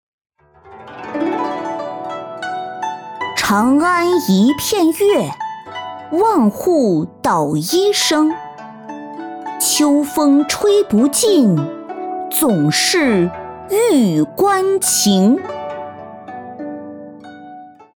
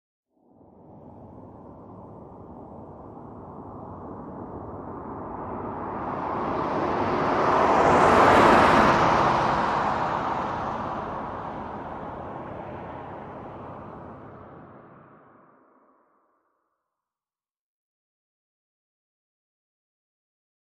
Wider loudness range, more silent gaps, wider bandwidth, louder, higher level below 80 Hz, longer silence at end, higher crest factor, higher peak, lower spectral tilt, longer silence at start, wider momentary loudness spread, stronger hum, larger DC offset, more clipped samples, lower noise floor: second, 4 LU vs 24 LU; neither; first, over 20 kHz vs 13.5 kHz; first, -15 LUFS vs -22 LUFS; second, -56 dBFS vs -50 dBFS; second, 0.25 s vs 5.7 s; second, 12 dB vs 22 dB; about the same, -4 dBFS vs -4 dBFS; second, -4 dB/octave vs -6 dB/octave; second, 0.65 s vs 0.9 s; second, 18 LU vs 27 LU; neither; neither; neither; second, -42 dBFS vs under -90 dBFS